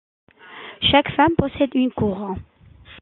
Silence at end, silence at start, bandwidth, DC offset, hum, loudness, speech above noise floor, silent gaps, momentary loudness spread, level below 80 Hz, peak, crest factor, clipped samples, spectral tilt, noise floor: 0.05 s; 0.5 s; 4.3 kHz; under 0.1%; none; -19 LUFS; 27 dB; none; 17 LU; -44 dBFS; -2 dBFS; 20 dB; under 0.1%; -9.5 dB/octave; -46 dBFS